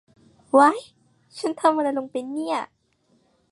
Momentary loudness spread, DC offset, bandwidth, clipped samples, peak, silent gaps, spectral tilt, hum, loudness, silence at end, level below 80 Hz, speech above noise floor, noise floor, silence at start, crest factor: 16 LU; under 0.1%; 11.5 kHz; under 0.1%; -4 dBFS; none; -4 dB/octave; none; -22 LUFS; 0.85 s; -76 dBFS; 44 dB; -65 dBFS; 0.55 s; 20 dB